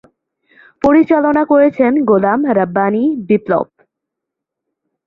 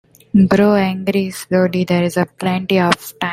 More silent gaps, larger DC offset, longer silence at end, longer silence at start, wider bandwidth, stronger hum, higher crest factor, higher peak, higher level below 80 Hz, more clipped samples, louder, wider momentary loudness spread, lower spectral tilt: neither; neither; first, 1.45 s vs 0 s; first, 0.85 s vs 0.35 s; second, 6.4 kHz vs 16 kHz; neither; about the same, 14 dB vs 16 dB; about the same, 0 dBFS vs 0 dBFS; about the same, -52 dBFS vs -50 dBFS; neither; first, -13 LUFS vs -16 LUFS; about the same, 6 LU vs 7 LU; first, -9.5 dB/octave vs -6.5 dB/octave